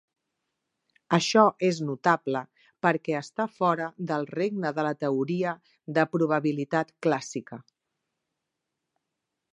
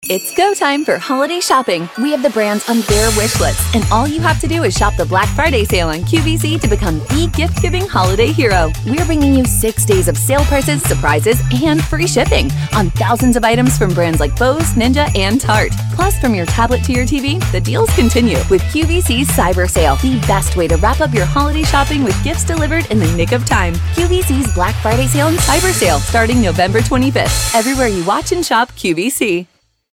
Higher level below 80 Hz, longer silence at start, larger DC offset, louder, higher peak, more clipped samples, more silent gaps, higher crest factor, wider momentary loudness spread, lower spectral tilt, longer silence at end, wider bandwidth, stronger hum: second, -76 dBFS vs -22 dBFS; first, 1.1 s vs 0 s; neither; second, -27 LUFS vs -13 LUFS; about the same, -4 dBFS vs -2 dBFS; neither; neither; first, 24 dB vs 12 dB; first, 10 LU vs 4 LU; about the same, -5.5 dB/octave vs -4.5 dB/octave; first, 1.95 s vs 0.5 s; second, 10.5 kHz vs 17.5 kHz; neither